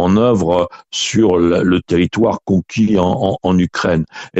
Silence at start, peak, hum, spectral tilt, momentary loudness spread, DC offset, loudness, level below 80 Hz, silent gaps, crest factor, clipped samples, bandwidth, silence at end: 0 s; -2 dBFS; none; -6 dB/octave; 5 LU; under 0.1%; -15 LUFS; -42 dBFS; none; 12 dB; under 0.1%; 8.2 kHz; 0 s